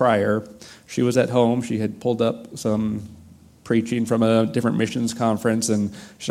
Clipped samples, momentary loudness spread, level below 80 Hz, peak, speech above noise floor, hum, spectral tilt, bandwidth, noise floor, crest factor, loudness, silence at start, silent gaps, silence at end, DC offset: under 0.1%; 10 LU; -58 dBFS; -4 dBFS; 25 dB; none; -6 dB/octave; 14.5 kHz; -47 dBFS; 18 dB; -22 LUFS; 0 s; none; 0 s; under 0.1%